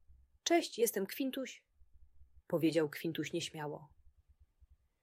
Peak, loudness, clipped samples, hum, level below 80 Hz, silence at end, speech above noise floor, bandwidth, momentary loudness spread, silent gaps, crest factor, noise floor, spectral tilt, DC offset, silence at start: -18 dBFS; -36 LUFS; under 0.1%; none; -70 dBFS; 0.4 s; 33 dB; 16 kHz; 13 LU; none; 20 dB; -68 dBFS; -4 dB/octave; under 0.1%; 0.1 s